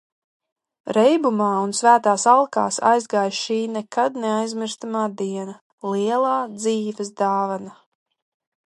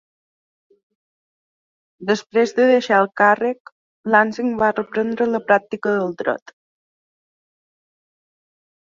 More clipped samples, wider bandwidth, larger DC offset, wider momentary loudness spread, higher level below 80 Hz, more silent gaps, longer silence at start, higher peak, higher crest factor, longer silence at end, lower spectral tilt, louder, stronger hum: neither; first, 11.5 kHz vs 7.6 kHz; neither; first, 12 LU vs 9 LU; second, -76 dBFS vs -64 dBFS; second, 5.61-5.78 s vs 3.60-3.65 s, 3.72-4.04 s; second, 0.85 s vs 2 s; about the same, -2 dBFS vs -2 dBFS; about the same, 20 dB vs 20 dB; second, 0.95 s vs 2.45 s; second, -4 dB/octave vs -5.5 dB/octave; about the same, -20 LUFS vs -18 LUFS; neither